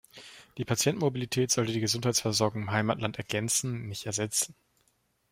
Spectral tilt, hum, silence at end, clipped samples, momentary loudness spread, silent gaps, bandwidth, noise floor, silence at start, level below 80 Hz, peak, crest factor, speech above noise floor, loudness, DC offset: -3.5 dB/octave; none; 0.8 s; under 0.1%; 9 LU; none; 16 kHz; -72 dBFS; 0.15 s; -64 dBFS; -10 dBFS; 20 dB; 43 dB; -29 LUFS; under 0.1%